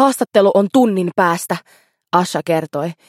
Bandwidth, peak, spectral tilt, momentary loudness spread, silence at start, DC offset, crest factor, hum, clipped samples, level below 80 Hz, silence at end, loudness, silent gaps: 16.5 kHz; 0 dBFS; -5.5 dB/octave; 10 LU; 0 s; under 0.1%; 16 dB; none; under 0.1%; -68 dBFS; 0.15 s; -16 LUFS; none